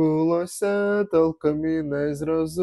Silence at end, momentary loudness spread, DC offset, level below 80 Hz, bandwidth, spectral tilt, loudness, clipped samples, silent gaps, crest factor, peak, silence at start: 0 s; 5 LU; under 0.1%; -56 dBFS; 12.5 kHz; -7 dB/octave; -23 LUFS; under 0.1%; none; 14 dB; -8 dBFS; 0 s